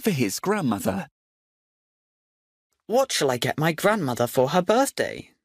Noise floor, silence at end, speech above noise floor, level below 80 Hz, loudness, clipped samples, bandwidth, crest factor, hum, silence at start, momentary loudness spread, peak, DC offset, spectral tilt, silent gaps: under -90 dBFS; 0.2 s; over 67 dB; -62 dBFS; -23 LUFS; under 0.1%; 15.5 kHz; 18 dB; none; 0 s; 8 LU; -8 dBFS; under 0.1%; -4.5 dB/octave; 1.11-2.70 s